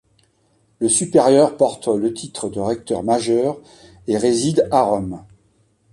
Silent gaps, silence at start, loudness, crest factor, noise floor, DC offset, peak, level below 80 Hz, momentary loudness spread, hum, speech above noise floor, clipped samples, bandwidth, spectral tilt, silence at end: none; 0.8 s; -18 LUFS; 16 dB; -61 dBFS; under 0.1%; -2 dBFS; -52 dBFS; 13 LU; none; 43 dB; under 0.1%; 11.5 kHz; -5 dB/octave; 0.7 s